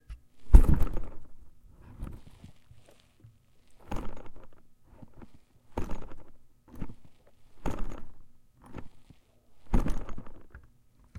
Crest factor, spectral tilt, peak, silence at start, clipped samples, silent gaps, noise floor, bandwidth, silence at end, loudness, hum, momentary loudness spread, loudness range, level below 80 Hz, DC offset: 26 dB; -8 dB/octave; -2 dBFS; 0.1 s; under 0.1%; none; -60 dBFS; 10.5 kHz; 0 s; -32 LUFS; none; 29 LU; 17 LU; -30 dBFS; under 0.1%